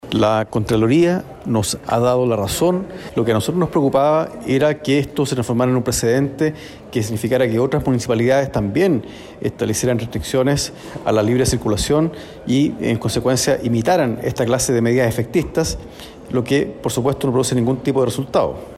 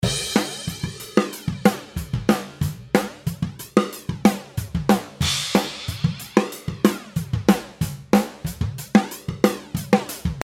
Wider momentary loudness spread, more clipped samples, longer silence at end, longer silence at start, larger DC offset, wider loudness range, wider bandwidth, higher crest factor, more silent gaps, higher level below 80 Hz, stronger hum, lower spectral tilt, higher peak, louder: about the same, 7 LU vs 9 LU; neither; about the same, 0 s vs 0 s; about the same, 0.05 s vs 0 s; neither; about the same, 2 LU vs 1 LU; about the same, 16 kHz vs 17 kHz; second, 12 dB vs 22 dB; neither; about the same, -40 dBFS vs -40 dBFS; neither; about the same, -5.5 dB/octave vs -5 dB/octave; second, -6 dBFS vs 0 dBFS; first, -18 LUFS vs -23 LUFS